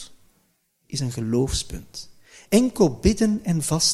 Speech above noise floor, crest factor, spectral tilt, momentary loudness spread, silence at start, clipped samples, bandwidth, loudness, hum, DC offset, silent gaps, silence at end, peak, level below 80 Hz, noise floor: 46 dB; 18 dB; -4.5 dB/octave; 17 LU; 0 s; under 0.1%; 15 kHz; -22 LUFS; none; under 0.1%; none; 0 s; -4 dBFS; -38 dBFS; -67 dBFS